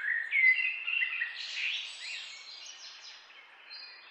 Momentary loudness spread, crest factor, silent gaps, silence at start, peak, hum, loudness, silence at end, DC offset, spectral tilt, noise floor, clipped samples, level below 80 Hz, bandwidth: 22 LU; 20 dB; none; 0 s; -14 dBFS; none; -29 LUFS; 0 s; under 0.1%; 5 dB/octave; -54 dBFS; under 0.1%; under -90 dBFS; 8.8 kHz